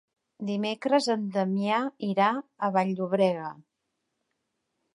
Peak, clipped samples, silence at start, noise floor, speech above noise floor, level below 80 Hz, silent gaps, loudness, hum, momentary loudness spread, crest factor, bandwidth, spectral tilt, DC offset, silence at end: -10 dBFS; under 0.1%; 0.4 s; -81 dBFS; 54 dB; -82 dBFS; none; -27 LUFS; none; 7 LU; 18 dB; 11 kHz; -6 dB/octave; under 0.1%; 1.35 s